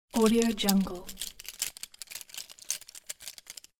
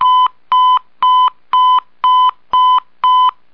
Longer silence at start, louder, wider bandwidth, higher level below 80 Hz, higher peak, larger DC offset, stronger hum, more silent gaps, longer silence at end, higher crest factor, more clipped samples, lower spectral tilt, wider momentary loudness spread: first, 0.15 s vs 0 s; second, -31 LUFS vs -12 LUFS; first, 19 kHz vs 5.4 kHz; first, -54 dBFS vs -62 dBFS; about the same, -6 dBFS vs -4 dBFS; second, under 0.1% vs 0.7%; neither; neither; about the same, 0.3 s vs 0.25 s; first, 26 dB vs 8 dB; neither; first, -4 dB/octave vs -1.5 dB/octave; first, 17 LU vs 2 LU